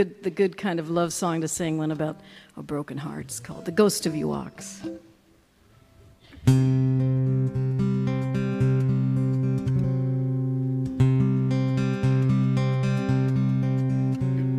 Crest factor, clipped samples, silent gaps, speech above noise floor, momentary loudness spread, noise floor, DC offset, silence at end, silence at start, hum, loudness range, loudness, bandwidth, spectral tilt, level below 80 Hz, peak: 18 dB; under 0.1%; none; 32 dB; 11 LU; -59 dBFS; under 0.1%; 0 s; 0 s; none; 5 LU; -25 LUFS; 13 kHz; -7 dB/octave; -50 dBFS; -6 dBFS